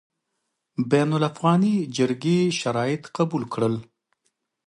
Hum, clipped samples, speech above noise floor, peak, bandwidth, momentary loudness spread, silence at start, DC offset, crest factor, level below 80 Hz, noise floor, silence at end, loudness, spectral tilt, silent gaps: none; under 0.1%; 56 dB; -6 dBFS; 11.5 kHz; 6 LU; 0.8 s; under 0.1%; 18 dB; -66 dBFS; -78 dBFS; 0.85 s; -23 LUFS; -6.5 dB/octave; none